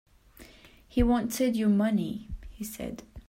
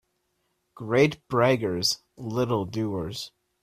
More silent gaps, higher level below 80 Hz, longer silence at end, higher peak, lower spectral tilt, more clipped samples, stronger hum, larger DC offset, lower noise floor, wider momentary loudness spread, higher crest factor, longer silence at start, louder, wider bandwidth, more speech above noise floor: neither; first, -42 dBFS vs -58 dBFS; second, 0.1 s vs 0.35 s; second, -12 dBFS vs -6 dBFS; about the same, -6 dB/octave vs -5 dB/octave; neither; neither; neither; second, -54 dBFS vs -74 dBFS; about the same, 15 LU vs 13 LU; about the same, 18 dB vs 20 dB; second, 0.4 s vs 0.75 s; about the same, -28 LUFS vs -26 LUFS; about the same, 16 kHz vs 15.5 kHz; second, 27 dB vs 49 dB